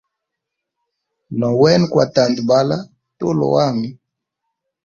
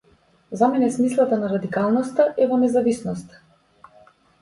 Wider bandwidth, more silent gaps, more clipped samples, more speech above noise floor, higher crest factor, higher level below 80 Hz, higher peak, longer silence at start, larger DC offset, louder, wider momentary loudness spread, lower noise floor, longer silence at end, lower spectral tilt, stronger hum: second, 7.4 kHz vs 11.5 kHz; neither; neither; first, 65 dB vs 38 dB; about the same, 18 dB vs 16 dB; about the same, -56 dBFS vs -60 dBFS; first, 0 dBFS vs -6 dBFS; first, 1.3 s vs 0.5 s; neither; first, -16 LUFS vs -20 LUFS; first, 12 LU vs 9 LU; first, -80 dBFS vs -58 dBFS; second, 0.9 s vs 1.15 s; about the same, -6.5 dB/octave vs -7 dB/octave; neither